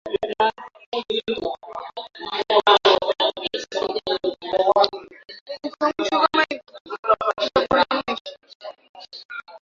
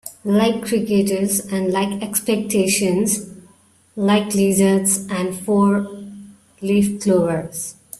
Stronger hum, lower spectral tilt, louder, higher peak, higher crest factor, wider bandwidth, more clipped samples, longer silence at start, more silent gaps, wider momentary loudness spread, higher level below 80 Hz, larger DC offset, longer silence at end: neither; second, -3.5 dB/octave vs -5 dB/octave; second, -21 LUFS vs -18 LUFS; first, 0 dBFS vs -4 dBFS; first, 22 dB vs 16 dB; second, 7.6 kHz vs 15 kHz; neither; about the same, 0.05 s vs 0.05 s; first, 0.86-0.92 s, 5.41-5.46 s, 6.81-6.85 s, 6.99-7.03 s, 8.21-8.25 s, 8.55-8.60 s, 8.89-8.94 s, 9.25-9.29 s vs none; first, 21 LU vs 12 LU; about the same, -58 dBFS vs -56 dBFS; neither; about the same, 0.05 s vs 0.05 s